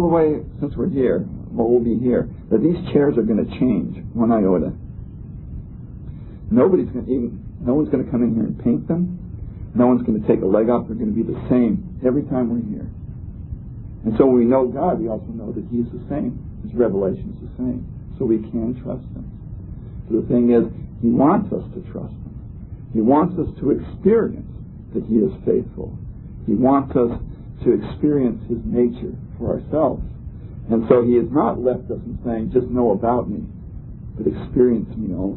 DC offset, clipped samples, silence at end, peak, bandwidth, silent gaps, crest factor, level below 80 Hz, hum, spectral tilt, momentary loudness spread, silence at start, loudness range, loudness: under 0.1%; under 0.1%; 0 s; 0 dBFS; 4.2 kHz; none; 20 dB; -38 dBFS; none; -13.5 dB/octave; 18 LU; 0 s; 4 LU; -20 LUFS